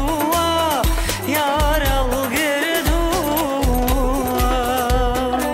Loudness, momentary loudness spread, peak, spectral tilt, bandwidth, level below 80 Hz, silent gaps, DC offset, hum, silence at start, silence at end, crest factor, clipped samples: -19 LUFS; 2 LU; -8 dBFS; -4 dB/octave; 16.5 kHz; -24 dBFS; none; under 0.1%; none; 0 s; 0 s; 10 dB; under 0.1%